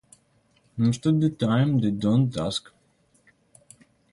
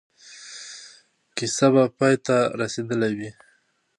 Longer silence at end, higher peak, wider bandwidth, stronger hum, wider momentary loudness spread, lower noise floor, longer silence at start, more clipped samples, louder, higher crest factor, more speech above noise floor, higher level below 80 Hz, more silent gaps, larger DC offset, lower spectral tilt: first, 1.55 s vs 0.65 s; second, -10 dBFS vs -4 dBFS; about the same, 11.5 kHz vs 11.5 kHz; neither; second, 8 LU vs 20 LU; about the same, -64 dBFS vs -64 dBFS; first, 0.75 s vs 0.25 s; neither; about the same, -24 LUFS vs -22 LUFS; about the same, 16 dB vs 20 dB; about the same, 42 dB vs 43 dB; first, -58 dBFS vs -68 dBFS; neither; neither; first, -7 dB/octave vs -5 dB/octave